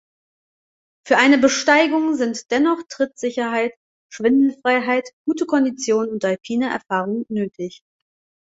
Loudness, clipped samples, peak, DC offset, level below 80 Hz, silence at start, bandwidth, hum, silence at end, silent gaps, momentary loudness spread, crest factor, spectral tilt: -19 LUFS; under 0.1%; -2 dBFS; under 0.1%; -66 dBFS; 1.05 s; 8 kHz; none; 0.85 s; 3.77-4.10 s, 5.13-5.25 s; 10 LU; 18 dB; -4 dB/octave